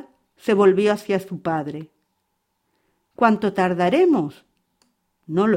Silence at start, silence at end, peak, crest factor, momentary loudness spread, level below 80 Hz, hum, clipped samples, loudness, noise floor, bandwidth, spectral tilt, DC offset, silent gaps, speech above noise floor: 0.45 s; 0 s; -2 dBFS; 20 dB; 13 LU; -64 dBFS; none; under 0.1%; -20 LUFS; -73 dBFS; 15.5 kHz; -7 dB/octave; under 0.1%; none; 54 dB